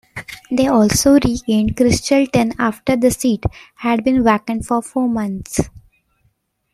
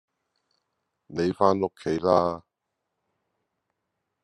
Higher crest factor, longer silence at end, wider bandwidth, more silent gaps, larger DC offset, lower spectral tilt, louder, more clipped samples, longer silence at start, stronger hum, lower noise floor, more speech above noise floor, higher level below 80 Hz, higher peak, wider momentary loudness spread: second, 16 dB vs 24 dB; second, 0.95 s vs 1.85 s; first, 15 kHz vs 10.5 kHz; neither; neither; second, -5 dB/octave vs -7 dB/octave; first, -16 LUFS vs -25 LUFS; neither; second, 0.15 s vs 1.1 s; neither; second, -63 dBFS vs -82 dBFS; second, 48 dB vs 58 dB; first, -38 dBFS vs -66 dBFS; first, -2 dBFS vs -6 dBFS; about the same, 10 LU vs 11 LU